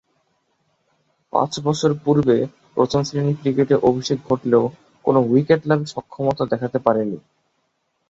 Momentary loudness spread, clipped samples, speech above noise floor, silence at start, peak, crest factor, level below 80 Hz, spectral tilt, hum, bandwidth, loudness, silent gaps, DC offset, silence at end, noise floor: 8 LU; under 0.1%; 51 dB; 1.35 s; 0 dBFS; 20 dB; -56 dBFS; -6.5 dB/octave; none; 8 kHz; -20 LUFS; none; under 0.1%; 0.9 s; -70 dBFS